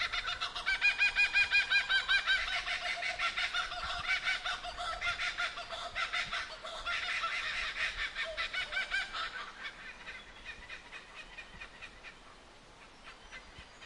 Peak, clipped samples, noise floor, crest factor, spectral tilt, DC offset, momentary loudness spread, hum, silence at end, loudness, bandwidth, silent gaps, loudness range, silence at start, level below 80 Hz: -18 dBFS; under 0.1%; -56 dBFS; 18 dB; 0 dB/octave; under 0.1%; 21 LU; none; 0 s; -32 LUFS; 11.5 kHz; none; 19 LU; 0 s; -56 dBFS